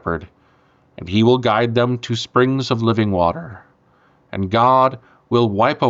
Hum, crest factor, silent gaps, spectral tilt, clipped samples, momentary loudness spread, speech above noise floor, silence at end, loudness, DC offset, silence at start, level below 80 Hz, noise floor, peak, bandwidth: none; 14 dB; none; -7 dB/octave; under 0.1%; 15 LU; 39 dB; 0 s; -17 LUFS; under 0.1%; 0.05 s; -50 dBFS; -56 dBFS; -4 dBFS; 7.8 kHz